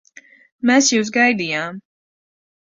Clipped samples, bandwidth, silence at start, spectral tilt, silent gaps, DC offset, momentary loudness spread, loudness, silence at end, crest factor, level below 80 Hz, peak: under 0.1%; 7.6 kHz; 0.65 s; -2.5 dB/octave; none; under 0.1%; 10 LU; -16 LUFS; 1 s; 18 dB; -66 dBFS; -2 dBFS